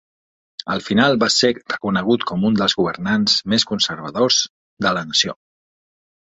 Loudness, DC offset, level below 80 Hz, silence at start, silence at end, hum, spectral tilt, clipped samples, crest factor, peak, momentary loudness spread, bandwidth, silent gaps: -18 LUFS; under 0.1%; -54 dBFS; 0.65 s; 0.95 s; none; -3.5 dB/octave; under 0.1%; 18 dB; -2 dBFS; 9 LU; 8.2 kHz; 4.50-4.77 s